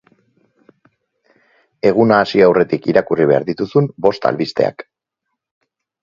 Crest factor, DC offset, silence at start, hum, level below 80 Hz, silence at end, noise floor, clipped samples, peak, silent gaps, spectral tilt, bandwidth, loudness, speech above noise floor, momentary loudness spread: 16 dB; under 0.1%; 1.85 s; none; -56 dBFS; 1.2 s; -77 dBFS; under 0.1%; 0 dBFS; none; -7.5 dB/octave; 7.2 kHz; -15 LUFS; 63 dB; 7 LU